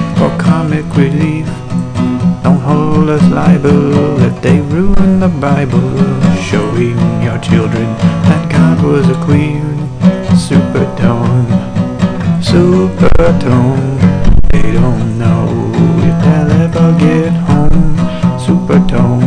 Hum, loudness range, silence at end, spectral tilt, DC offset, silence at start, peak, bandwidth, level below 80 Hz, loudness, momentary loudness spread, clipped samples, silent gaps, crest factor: none; 2 LU; 0 s; -8 dB/octave; under 0.1%; 0 s; 0 dBFS; 10 kHz; -20 dBFS; -10 LUFS; 5 LU; 0.6%; none; 8 dB